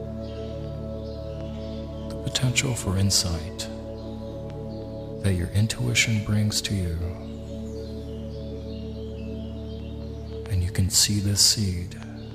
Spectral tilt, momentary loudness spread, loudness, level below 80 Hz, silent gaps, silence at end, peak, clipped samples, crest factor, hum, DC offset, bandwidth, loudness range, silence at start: -3.5 dB/octave; 16 LU; -26 LUFS; -40 dBFS; none; 0 s; -4 dBFS; under 0.1%; 22 dB; none; under 0.1%; 15.5 kHz; 9 LU; 0 s